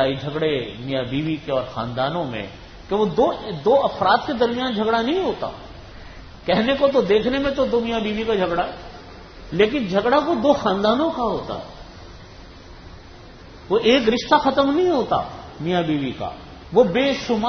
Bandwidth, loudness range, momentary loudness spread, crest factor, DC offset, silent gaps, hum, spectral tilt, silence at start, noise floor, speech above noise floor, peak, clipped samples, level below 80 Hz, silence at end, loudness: 6.6 kHz; 4 LU; 21 LU; 20 dB; under 0.1%; none; none; -6 dB/octave; 0 s; -41 dBFS; 22 dB; -2 dBFS; under 0.1%; -44 dBFS; 0 s; -20 LUFS